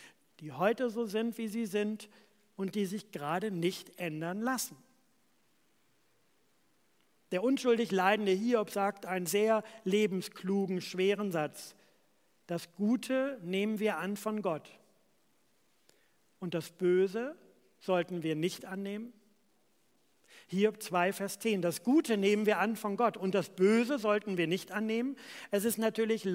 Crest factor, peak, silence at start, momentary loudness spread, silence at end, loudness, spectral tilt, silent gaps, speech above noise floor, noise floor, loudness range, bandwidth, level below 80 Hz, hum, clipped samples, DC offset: 20 dB; -14 dBFS; 0 s; 11 LU; 0 s; -33 LUFS; -5 dB/octave; none; 41 dB; -73 dBFS; 8 LU; 16.5 kHz; -86 dBFS; none; under 0.1%; under 0.1%